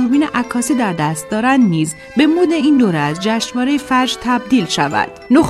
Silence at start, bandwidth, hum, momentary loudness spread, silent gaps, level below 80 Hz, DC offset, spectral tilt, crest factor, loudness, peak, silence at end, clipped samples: 0 s; 13.5 kHz; none; 5 LU; none; -48 dBFS; under 0.1%; -5 dB/octave; 14 dB; -15 LUFS; 0 dBFS; 0 s; under 0.1%